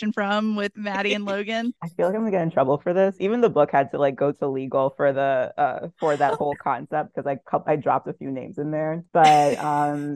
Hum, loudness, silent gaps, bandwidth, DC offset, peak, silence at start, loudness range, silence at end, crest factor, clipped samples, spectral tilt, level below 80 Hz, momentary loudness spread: none; -23 LUFS; none; 13.5 kHz; under 0.1%; -4 dBFS; 0 s; 3 LU; 0 s; 18 dB; under 0.1%; -6 dB/octave; -68 dBFS; 8 LU